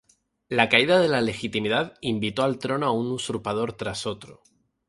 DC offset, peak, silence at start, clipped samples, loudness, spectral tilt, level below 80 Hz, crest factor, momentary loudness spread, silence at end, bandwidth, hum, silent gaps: under 0.1%; -2 dBFS; 0.5 s; under 0.1%; -24 LUFS; -4.5 dB/octave; -58 dBFS; 22 dB; 11 LU; 0.55 s; 11.5 kHz; none; none